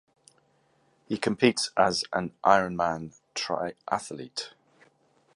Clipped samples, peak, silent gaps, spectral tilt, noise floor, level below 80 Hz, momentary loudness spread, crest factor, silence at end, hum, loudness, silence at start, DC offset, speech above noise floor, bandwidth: under 0.1%; -4 dBFS; none; -4 dB/octave; -67 dBFS; -64 dBFS; 14 LU; 26 dB; 0.85 s; none; -27 LUFS; 1.1 s; under 0.1%; 40 dB; 11.5 kHz